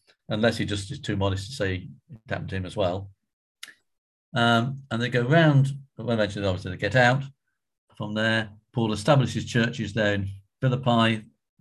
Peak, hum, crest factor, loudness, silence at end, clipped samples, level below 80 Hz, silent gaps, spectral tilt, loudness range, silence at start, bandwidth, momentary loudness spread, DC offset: -6 dBFS; none; 20 dB; -25 LUFS; 0.35 s; under 0.1%; -50 dBFS; 3.33-3.55 s, 3.98-4.32 s, 7.78-7.87 s; -6 dB/octave; 7 LU; 0.3 s; 12 kHz; 14 LU; under 0.1%